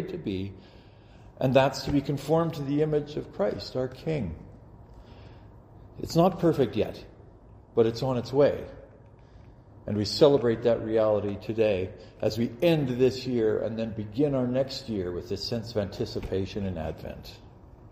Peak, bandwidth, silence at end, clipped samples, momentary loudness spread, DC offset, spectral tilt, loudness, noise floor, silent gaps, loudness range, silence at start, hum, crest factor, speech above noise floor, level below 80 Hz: -6 dBFS; 15.5 kHz; 0 s; under 0.1%; 13 LU; under 0.1%; -7 dB/octave; -27 LUFS; -52 dBFS; none; 5 LU; 0 s; none; 22 dB; 25 dB; -50 dBFS